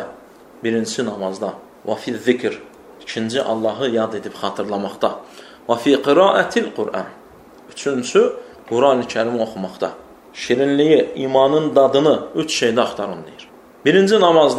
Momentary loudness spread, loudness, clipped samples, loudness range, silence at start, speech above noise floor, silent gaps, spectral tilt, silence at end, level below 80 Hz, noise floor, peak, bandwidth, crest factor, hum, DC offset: 15 LU; -18 LUFS; under 0.1%; 6 LU; 0 s; 26 dB; none; -4.5 dB/octave; 0 s; -60 dBFS; -43 dBFS; 0 dBFS; 13 kHz; 18 dB; none; under 0.1%